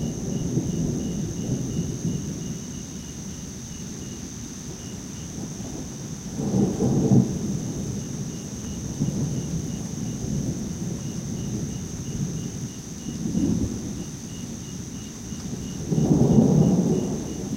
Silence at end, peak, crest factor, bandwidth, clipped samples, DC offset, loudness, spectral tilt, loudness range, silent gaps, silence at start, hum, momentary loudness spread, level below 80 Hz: 0 s; -4 dBFS; 22 dB; 16 kHz; under 0.1%; under 0.1%; -27 LUFS; -6.5 dB/octave; 9 LU; none; 0 s; none; 15 LU; -42 dBFS